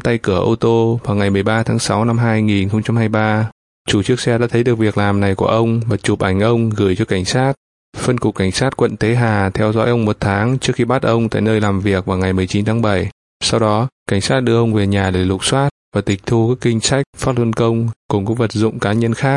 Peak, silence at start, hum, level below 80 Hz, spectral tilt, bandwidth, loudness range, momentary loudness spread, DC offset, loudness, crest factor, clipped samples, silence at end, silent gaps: 0 dBFS; 0.05 s; none; -44 dBFS; -6 dB/octave; 11.5 kHz; 1 LU; 4 LU; under 0.1%; -16 LUFS; 16 dB; under 0.1%; 0 s; 3.52-3.85 s, 7.57-7.93 s, 13.12-13.40 s, 13.92-14.06 s, 15.71-15.92 s, 17.06-17.13 s, 17.96-18.09 s